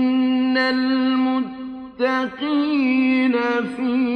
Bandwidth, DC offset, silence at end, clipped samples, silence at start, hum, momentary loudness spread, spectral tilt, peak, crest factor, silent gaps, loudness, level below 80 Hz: 5.2 kHz; under 0.1%; 0 s; under 0.1%; 0 s; none; 6 LU; -5.5 dB/octave; -8 dBFS; 10 dB; none; -20 LUFS; -60 dBFS